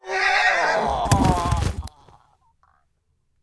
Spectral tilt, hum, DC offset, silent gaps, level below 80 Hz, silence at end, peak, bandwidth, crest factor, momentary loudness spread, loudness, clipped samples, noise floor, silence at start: -4.5 dB/octave; none; under 0.1%; none; -34 dBFS; 1.55 s; -4 dBFS; 11 kHz; 18 dB; 12 LU; -20 LUFS; under 0.1%; -68 dBFS; 0.05 s